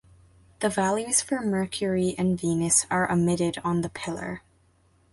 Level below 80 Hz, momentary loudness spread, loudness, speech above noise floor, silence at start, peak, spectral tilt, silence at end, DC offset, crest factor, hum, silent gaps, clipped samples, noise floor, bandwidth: -56 dBFS; 11 LU; -25 LUFS; 37 dB; 0.6 s; -8 dBFS; -4.5 dB/octave; 0.75 s; under 0.1%; 20 dB; none; none; under 0.1%; -63 dBFS; 11.5 kHz